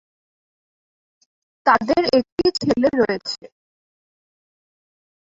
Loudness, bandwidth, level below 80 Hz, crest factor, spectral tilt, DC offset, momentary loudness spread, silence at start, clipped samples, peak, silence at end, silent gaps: -19 LUFS; 8 kHz; -54 dBFS; 20 dB; -5 dB/octave; under 0.1%; 9 LU; 1.65 s; under 0.1%; -2 dBFS; 1.95 s; 2.32-2.37 s